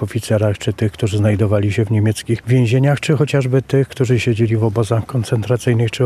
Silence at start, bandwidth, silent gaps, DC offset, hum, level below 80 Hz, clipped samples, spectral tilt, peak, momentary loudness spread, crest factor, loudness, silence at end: 0 s; 13.5 kHz; none; under 0.1%; none; -46 dBFS; under 0.1%; -7 dB/octave; -2 dBFS; 4 LU; 14 dB; -17 LUFS; 0 s